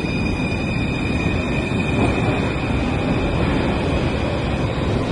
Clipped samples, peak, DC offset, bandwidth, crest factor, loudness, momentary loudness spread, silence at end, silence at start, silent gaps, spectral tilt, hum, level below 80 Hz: under 0.1%; -6 dBFS; under 0.1%; 11.5 kHz; 14 dB; -21 LUFS; 3 LU; 0 s; 0 s; none; -7 dB/octave; none; -30 dBFS